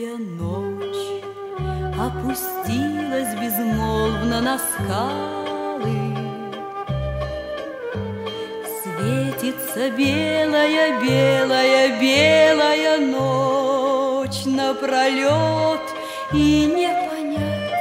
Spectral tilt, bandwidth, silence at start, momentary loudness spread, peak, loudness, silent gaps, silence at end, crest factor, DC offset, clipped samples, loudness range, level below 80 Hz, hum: -5 dB/octave; 16 kHz; 0 s; 13 LU; -4 dBFS; -20 LUFS; none; 0 s; 16 dB; under 0.1%; under 0.1%; 10 LU; -40 dBFS; none